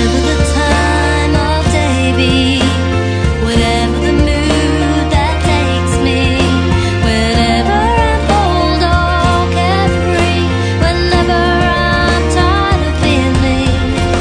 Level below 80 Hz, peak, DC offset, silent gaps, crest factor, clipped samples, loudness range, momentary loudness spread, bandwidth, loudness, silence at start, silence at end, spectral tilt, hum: -18 dBFS; 0 dBFS; under 0.1%; none; 12 dB; under 0.1%; 1 LU; 2 LU; 10 kHz; -12 LUFS; 0 s; 0 s; -5.5 dB/octave; none